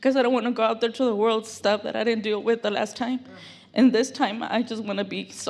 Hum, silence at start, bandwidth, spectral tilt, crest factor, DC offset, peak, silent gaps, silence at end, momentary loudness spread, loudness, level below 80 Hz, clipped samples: none; 0 s; 12 kHz; -4.5 dB/octave; 18 dB; under 0.1%; -6 dBFS; none; 0 s; 9 LU; -24 LUFS; -78 dBFS; under 0.1%